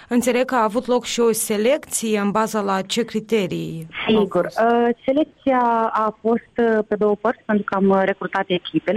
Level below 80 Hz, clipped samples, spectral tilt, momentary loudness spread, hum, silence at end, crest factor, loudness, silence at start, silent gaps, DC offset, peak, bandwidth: -58 dBFS; under 0.1%; -4.5 dB/octave; 5 LU; none; 0 s; 12 dB; -20 LUFS; 0 s; none; under 0.1%; -8 dBFS; 16 kHz